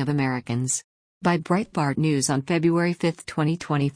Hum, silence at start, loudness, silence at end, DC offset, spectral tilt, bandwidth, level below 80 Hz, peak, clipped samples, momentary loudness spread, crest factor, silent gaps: none; 0 s; -24 LUFS; 0.05 s; under 0.1%; -5.5 dB/octave; 10.5 kHz; -58 dBFS; -8 dBFS; under 0.1%; 5 LU; 14 dB; 0.84-1.21 s